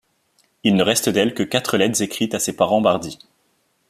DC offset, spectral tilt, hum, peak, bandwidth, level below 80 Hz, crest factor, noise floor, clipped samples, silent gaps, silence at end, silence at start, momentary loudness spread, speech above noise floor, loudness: under 0.1%; -4 dB/octave; none; -2 dBFS; 14.5 kHz; -58 dBFS; 18 dB; -65 dBFS; under 0.1%; none; 0.75 s; 0.65 s; 6 LU; 46 dB; -19 LUFS